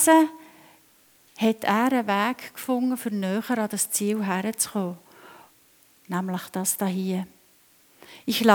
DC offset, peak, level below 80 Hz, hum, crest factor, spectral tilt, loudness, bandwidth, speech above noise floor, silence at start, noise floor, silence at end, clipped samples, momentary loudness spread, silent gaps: under 0.1%; -2 dBFS; -74 dBFS; none; 24 dB; -4 dB/octave; -25 LUFS; over 20 kHz; 35 dB; 0 s; -59 dBFS; 0 s; under 0.1%; 10 LU; none